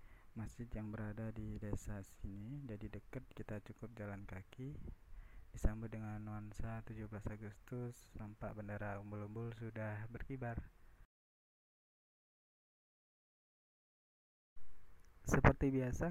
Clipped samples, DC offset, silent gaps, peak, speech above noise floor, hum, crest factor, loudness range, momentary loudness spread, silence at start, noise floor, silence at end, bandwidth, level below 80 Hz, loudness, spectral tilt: under 0.1%; under 0.1%; 11.05-14.56 s; -14 dBFS; over 47 dB; none; 32 dB; 9 LU; 14 LU; 0 s; under -90 dBFS; 0 s; 15.5 kHz; -52 dBFS; -45 LUFS; -7 dB/octave